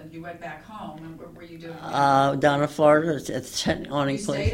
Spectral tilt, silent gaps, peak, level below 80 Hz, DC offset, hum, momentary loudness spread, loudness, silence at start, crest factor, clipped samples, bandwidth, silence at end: -5.5 dB/octave; none; -6 dBFS; -48 dBFS; under 0.1%; none; 21 LU; -22 LUFS; 0 s; 20 dB; under 0.1%; 16 kHz; 0 s